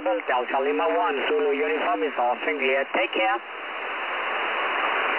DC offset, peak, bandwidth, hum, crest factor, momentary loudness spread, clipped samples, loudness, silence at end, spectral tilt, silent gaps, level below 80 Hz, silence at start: 0.1%; -12 dBFS; 4 kHz; none; 12 dB; 6 LU; under 0.1%; -24 LUFS; 0 s; -5.5 dB/octave; none; -76 dBFS; 0 s